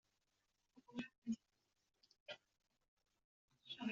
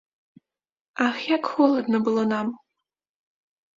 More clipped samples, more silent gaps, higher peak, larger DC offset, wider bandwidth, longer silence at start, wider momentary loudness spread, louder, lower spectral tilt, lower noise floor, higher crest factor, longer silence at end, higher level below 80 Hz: neither; first, 1.18-1.22 s, 2.20-2.26 s, 2.88-2.97 s, 3.24-3.48 s vs none; second, -34 dBFS vs -6 dBFS; neither; about the same, 7.4 kHz vs 7.6 kHz; second, 0.75 s vs 0.95 s; about the same, 12 LU vs 12 LU; second, -52 LUFS vs -23 LUFS; second, -3.5 dB/octave vs -6 dB/octave; about the same, -87 dBFS vs under -90 dBFS; about the same, 20 dB vs 20 dB; second, 0 s vs 1.2 s; second, -90 dBFS vs -72 dBFS